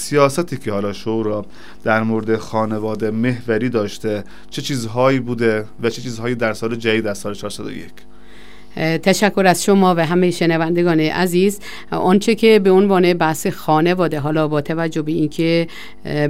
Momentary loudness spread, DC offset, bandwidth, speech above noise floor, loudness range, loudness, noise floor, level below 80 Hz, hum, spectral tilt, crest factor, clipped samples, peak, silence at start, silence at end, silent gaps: 12 LU; 2%; 16 kHz; 26 dB; 6 LU; -17 LUFS; -43 dBFS; -50 dBFS; none; -5.5 dB/octave; 16 dB; under 0.1%; 0 dBFS; 0 s; 0 s; none